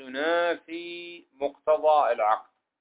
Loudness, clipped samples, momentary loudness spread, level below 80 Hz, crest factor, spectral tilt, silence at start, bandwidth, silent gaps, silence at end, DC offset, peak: -26 LUFS; under 0.1%; 16 LU; -76 dBFS; 18 dB; -6.5 dB/octave; 0 s; 4 kHz; none; 0.4 s; under 0.1%; -10 dBFS